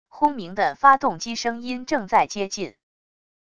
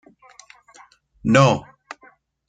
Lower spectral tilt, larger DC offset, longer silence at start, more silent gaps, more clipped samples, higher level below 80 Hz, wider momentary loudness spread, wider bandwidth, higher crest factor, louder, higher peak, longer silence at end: second, -3.5 dB/octave vs -6 dB/octave; first, 0.5% vs under 0.1%; second, 0.1 s vs 1.25 s; neither; neither; second, -60 dBFS vs -54 dBFS; second, 13 LU vs 26 LU; about the same, 10 kHz vs 9.4 kHz; about the same, 22 dB vs 22 dB; second, -22 LUFS vs -18 LUFS; about the same, 0 dBFS vs -2 dBFS; about the same, 0.8 s vs 0.9 s